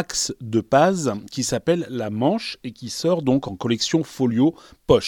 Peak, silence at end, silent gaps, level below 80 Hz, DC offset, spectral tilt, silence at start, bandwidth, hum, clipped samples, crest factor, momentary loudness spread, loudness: -2 dBFS; 0 s; none; -48 dBFS; under 0.1%; -5 dB/octave; 0 s; 17.5 kHz; none; under 0.1%; 18 dB; 8 LU; -22 LUFS